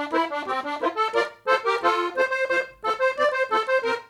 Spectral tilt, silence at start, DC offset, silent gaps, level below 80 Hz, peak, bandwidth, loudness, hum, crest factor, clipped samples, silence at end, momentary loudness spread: -2.5 dB/octave; 0 s; under 0.1%; none; -68 dBFS; -8 dBFS; 13 kHz; -24 LUFS; none; 16 dB; under 0.1%; 0.05 s; 5 LU